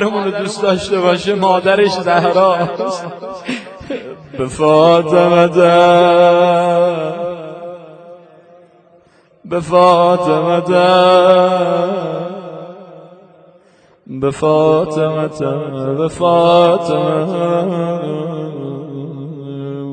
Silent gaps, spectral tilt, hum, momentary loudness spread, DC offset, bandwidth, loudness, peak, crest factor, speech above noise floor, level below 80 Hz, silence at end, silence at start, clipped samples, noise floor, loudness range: none; -6 dB/octave; none; 18 LU; under 0.1%; 9.2 kHz; -13 LUFS; 0 dBFS; 14 dB; 37 dB; -52 dBFS; 0 s; 0 s; under 0.1%; -49 dBFS; 7 LU